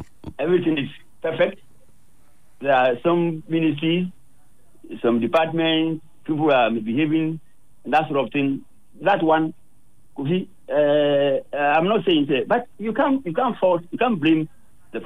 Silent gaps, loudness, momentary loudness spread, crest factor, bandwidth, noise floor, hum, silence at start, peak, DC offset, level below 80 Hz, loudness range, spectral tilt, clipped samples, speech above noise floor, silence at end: none; -21 LUFS; 11 LU; 14 dB; 10 kHz; -60 dBFS; none; 0 s; -8 dBFS; 0.8%; -60 dBFS; 3 LU; -7.5 dB/octave; under 0.1%; 40 dB; 0 s